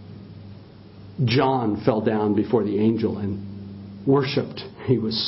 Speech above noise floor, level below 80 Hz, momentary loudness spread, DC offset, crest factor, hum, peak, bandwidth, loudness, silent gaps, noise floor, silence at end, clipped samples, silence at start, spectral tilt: 22 dB; -52 dBFS; 20 LU; under 0.1%; 18 dB; none; -4 dBFS; 5.8 kHz; -23 LUFS; none; -44 dBFS; 0 s; under 0.1%; 0 s; -10.5 dB/octave